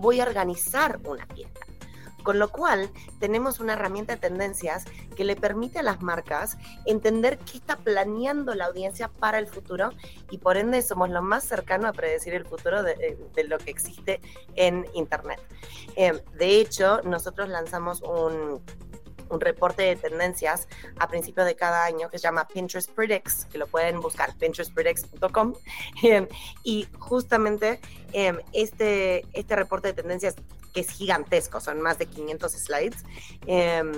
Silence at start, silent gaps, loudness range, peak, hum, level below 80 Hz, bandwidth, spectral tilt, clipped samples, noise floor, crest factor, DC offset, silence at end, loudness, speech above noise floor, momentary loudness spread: 0 s; none; 3 LU; -6 dBFS; none; -50 dBFS; 17 kHz; -3.5 dB/octave; under 0.1%; -45 dBFS; 20 dB; 0.5%; 0 s; -26 LUFS; 19 dB; 12 LU